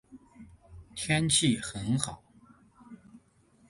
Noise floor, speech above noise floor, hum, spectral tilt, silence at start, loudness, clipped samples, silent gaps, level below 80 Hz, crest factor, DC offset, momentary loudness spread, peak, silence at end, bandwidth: -64 dBFS; 35 dB; none; -3.5 dB/octave; 0.1 s; -28 LUFS; under 0.1%; none; -56 dBFS; 22 dB; under 0.1%; 17 LU; -12 dBFS; 0.5 s; 11.5 kHz